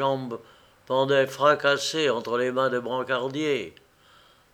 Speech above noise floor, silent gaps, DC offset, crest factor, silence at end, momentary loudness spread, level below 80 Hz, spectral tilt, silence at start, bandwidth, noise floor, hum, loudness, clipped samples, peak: 32 dB; none; under 0.1%; 20 dB; 0.85 s; 10 LU; -70 dBFS; -4 dB/octave; 0 s; 16.5 kHz; -57 dBFS; none; -24 LUFS; under 0.1%; -6 dBFS